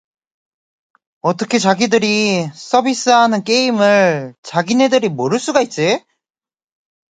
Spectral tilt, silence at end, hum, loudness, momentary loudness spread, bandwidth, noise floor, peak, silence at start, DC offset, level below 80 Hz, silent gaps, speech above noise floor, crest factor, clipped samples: -4 dB/octave; 1.15 s; none; -15 LUFS; 8 LU; 9.4 kHz; under -90 dBFS; 0 dBFS; 1.25 s; under 0.1%; -62 dBFS; 4.38-4.43 s; over 76 dB; 16 dB; under 0.1%